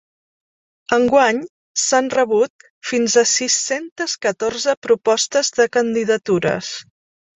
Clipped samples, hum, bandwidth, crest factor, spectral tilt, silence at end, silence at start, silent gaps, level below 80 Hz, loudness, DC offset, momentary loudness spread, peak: under 0.1%; none; 8.4 kHz; 18 dB; -2.5 dB/octave; 0.55 s; 0.9 s; 1.49-1.75 s, 2.50-2.59 s, 2.70-2.81 s, 3.92-3.96 s, 4.77-4.82 s; -60 dBFS; -18 LUFS; under 0.1%; 10 LU; 0 dBFS